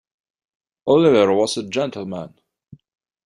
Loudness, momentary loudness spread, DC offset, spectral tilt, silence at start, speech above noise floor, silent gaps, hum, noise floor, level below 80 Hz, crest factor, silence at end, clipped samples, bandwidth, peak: -18 LUFS; 17 LU; under 0.1%; -5.5 dB/octave; 0.85 s; 31 dB; none; none; -48 dBFS; -62 dBFS; 18 dB; 1 s; under 0.1%; 11.5 kHz; -4 dBFS